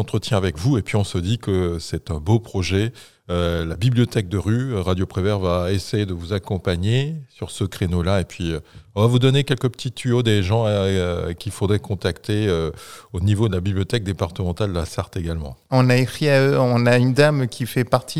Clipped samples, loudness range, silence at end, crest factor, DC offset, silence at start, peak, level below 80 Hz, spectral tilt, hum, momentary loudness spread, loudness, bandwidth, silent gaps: under 0.1%; 4 LU; 0 s; 20 dB; 0.4%; 0 s; 0 dBFS; -40 dBFS; -6.5 dB/octave; none; 10 LU; -21 LUFS; 14.5 kHz; none